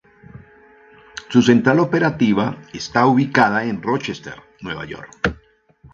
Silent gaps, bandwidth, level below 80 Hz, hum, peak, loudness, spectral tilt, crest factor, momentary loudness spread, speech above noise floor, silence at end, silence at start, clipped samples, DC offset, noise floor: none; 7.4 kHz; -48 dBFS; none; 0 dBFS; -18 LUFS; -6 dB/octave; 20 dB; 18 LU; 33 dB; 0.05 s; 0.35 s; under 0.1%; under 0.1%; -51 dBFS